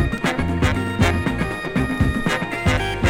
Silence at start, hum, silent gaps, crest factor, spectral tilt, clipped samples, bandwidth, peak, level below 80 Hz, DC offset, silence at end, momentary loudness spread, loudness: 0 s; none; none; 18 dB; -6 dB/octave; under 0.1%; 16.5 kHz; -2 dBFS; -30 dBFS; under 0.1%; 0 s; 4 LU; -21 LUFS